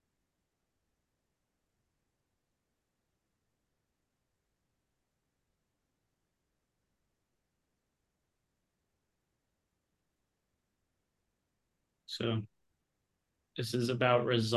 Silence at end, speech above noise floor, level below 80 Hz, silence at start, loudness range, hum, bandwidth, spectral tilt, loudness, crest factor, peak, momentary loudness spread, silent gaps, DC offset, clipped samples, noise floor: 0 s; 53 dB; -76 dBFS; 12.1 s; 9 LU; none; 12 kHz; -5.5 dB/octave; -33 LUFS; 28 dB; -12 dBFS; 17 LU; none; under 0.1%; under 0.1%; -84 dBFS